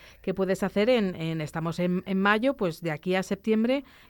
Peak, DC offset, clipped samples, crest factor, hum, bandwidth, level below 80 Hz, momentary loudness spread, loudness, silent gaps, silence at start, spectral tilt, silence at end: -10 dBFS; under 0.1%; under 0.1%; 18 dB; none; 19 kHz; -58 dBFS; 8 LU; -27 LUFS; none; 0.05 s; -6.5 dB/octave; 0.25 s